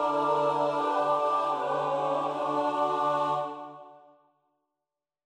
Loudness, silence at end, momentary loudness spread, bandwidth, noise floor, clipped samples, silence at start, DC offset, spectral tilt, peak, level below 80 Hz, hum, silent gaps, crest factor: -28 LUFS; 1.3 s; 5 LU; 10 kHz; -89 dBFS; under 0.1%; 0 s; under 0.1%; -5.5 dB/octave; -14 dBFS; -78 dBFS; none; none; 14 dB